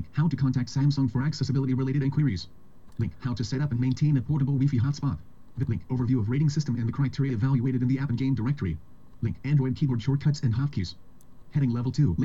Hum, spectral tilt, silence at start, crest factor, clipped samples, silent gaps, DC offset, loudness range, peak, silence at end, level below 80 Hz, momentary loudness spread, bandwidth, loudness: none; -8 dB/octave; 0 s; 14 dB; under 0.1%; none; 0.6%; 1 LU; -14 dBFS; 0 s; -50 dBFS; 9 LU; 7.6 kHz; -27 LUFS